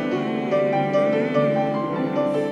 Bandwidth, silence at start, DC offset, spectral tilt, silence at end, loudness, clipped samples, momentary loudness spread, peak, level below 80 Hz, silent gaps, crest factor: 9.2 kHz; 0 s; under 0.1%; -7.5 dB/octave; 0 s; -22 LUFS; under 0.1%; 4 LU; -8 dBFS; -66 dBFS; none; 14 dB